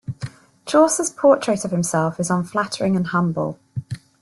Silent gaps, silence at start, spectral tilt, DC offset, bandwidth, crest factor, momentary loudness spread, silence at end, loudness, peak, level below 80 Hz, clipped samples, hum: none; 0.1 s; -5.5 dB/octave; under 0.1%; 12.5 kHz; 18 dB; 17 LU; 0.25 s; -20 LUFS; -4 dBFS; -58 dBFS; under 0.1%; none